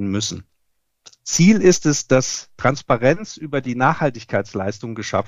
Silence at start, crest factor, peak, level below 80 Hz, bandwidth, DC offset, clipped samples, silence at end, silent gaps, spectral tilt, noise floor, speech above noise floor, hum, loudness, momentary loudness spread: 0 s; 18 dB; -2 dBFS; -50 dBFS; 13 kHz; under 0.1%; under 0.1%; 0 s; none; -5 dB/octave; -72 dBFS; 54 dB; none; -19 LUFS; 12 LU